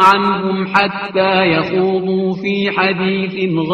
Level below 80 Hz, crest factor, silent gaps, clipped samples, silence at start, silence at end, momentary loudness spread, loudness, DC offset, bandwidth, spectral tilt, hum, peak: -52 dBFS; 14 dB; none; under 0.1%; 0 s; 0 s; 5 LU; -15 LUFS; under 0.1%; 10.5 kHz; -6.5 dB/octave; none; 0 dBFS